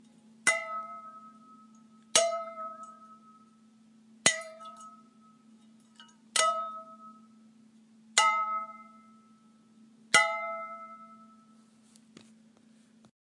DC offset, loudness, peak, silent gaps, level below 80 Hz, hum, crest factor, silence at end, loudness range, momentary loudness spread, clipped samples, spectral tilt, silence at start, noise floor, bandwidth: under 0.1%; -29 LUFS; -4 dBFS; none; -86 dBFS; none; 32 dB; 2.05 s; 6 LU; 26 LU; under 0.1%; 0.5 dB/octave; 0.45 s; -61 dBFS; 11.5 kHz